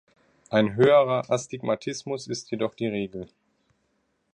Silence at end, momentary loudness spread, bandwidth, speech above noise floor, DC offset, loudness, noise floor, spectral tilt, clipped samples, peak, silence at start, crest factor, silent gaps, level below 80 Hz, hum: 1.1 s; 14 LU; 10 kHz; 48 dB; under 0.1%; -25 LUFS; -72 dBFS; -5.5 dB/octave; under 0.1%; -8 dBFS; 0.5 s; 20 dB; none; -64 dBFS; none